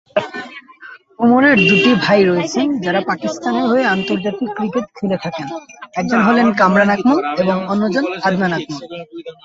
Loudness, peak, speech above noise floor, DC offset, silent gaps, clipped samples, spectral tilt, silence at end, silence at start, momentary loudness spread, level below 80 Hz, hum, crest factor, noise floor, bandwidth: -15 LUFS; -2 dBFS; 24 dB; under 0.1%; none; under 0.1%; -6 dB/octave; 0.1 s; 0.15 s; 17 LU; -56 dBFS; none; 14 dB; -39 dBFS; 7.8 kHz